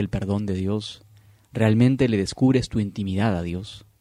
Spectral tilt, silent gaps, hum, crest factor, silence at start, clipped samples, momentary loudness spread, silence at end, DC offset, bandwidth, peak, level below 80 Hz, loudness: -7 dB/octave; none; none; 18 dB; 0 s; under 0.1%; 14 LU; 0.2 s; under 0.1%; 11.5 kHz; -6 dBFS; -46 dBFS; -23 LUFS